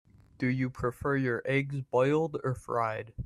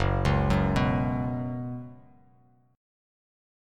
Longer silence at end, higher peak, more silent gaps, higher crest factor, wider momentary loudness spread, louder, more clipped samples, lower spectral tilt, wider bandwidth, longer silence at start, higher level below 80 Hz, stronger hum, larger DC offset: second, 0 s vs 1.75 s; second, -14 dBFS vs -10 dBFS; neither; about the same, 16 dB vs 18 dB; second, 6 LU vs 14 LU; second, -30 LUFS vs -27 LUFS; neither; about the same, -7.5 dB/octave vs -7.5 dB/octave; first, 13 kHz vs 10.5 kHz; first, 0.4 s vs 0 s; second, -54 dBFS vs -38 dBFS; neither; neither